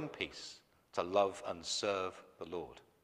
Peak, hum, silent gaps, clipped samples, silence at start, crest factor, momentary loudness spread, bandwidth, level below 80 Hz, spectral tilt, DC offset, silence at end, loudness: -18 dBFS; none; none; under 0.1%; 0 s; 22 dB; 17 LU; 13 kHz; -74 dBFS; -3 dB/octave; under 0.1%; 0.25 s; -38 LUFS